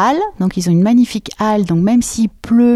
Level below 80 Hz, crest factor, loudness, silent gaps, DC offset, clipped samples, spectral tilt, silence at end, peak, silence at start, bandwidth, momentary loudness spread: -42 dBFS; 10 dB; -14 LUFS; none; under 0.1%; under 0.1%; -6.5 dB/octave; 0 s; -4 dBFS; 0 s; 13 kHz; 6 LU